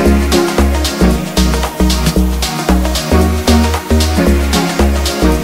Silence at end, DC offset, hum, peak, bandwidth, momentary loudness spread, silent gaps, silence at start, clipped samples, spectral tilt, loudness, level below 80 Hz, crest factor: 0 s; under 0.1%; none; 0 dBFS; 16.5 kHz; 2 LU; none; 0 s; under 0.1%; -5 dB/octave; -13 LUFS; -16 dBFS; 12 dB